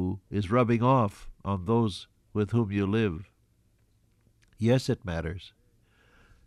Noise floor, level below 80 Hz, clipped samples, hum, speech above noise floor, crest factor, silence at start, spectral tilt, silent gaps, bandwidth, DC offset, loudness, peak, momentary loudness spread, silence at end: -67 dBFS; -52 dBFS; under 0.1%; none; 40 dB; 18 dB; 0 s; -7.5 dB/octave; none; 12 kHz; under 0.1%; -28 LUFS; -12 dBFS; 14 LU; 1 s